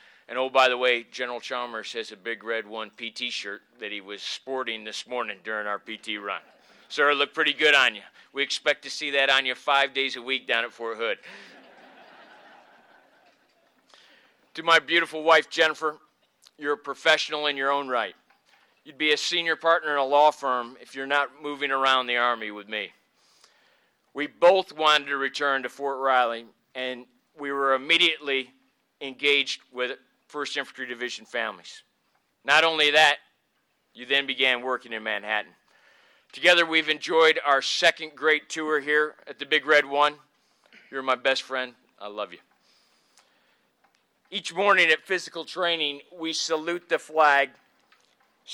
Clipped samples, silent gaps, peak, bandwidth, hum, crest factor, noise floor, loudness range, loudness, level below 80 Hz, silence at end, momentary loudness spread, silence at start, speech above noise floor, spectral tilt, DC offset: under 0.1%; none; -6 dBFS; 15.5 kHz; none; 22 dB; -72 dBFS; 9 LU; -24 LUFS; -78 dBFS; 0 s; 16 LU; 0.3 s; 47 dB; -1.5 dB/octave; under 0.1%